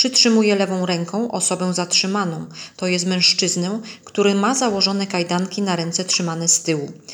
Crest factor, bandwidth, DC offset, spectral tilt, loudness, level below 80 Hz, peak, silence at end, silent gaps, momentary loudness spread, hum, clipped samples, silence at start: 20 dB; over 20 kHz; under 0.1%; -3 dB/octave; -18 LUFS; -70 dBFS; 0 dBFS; 0 s; none; 11 LU; none; under 0.1%; 0 s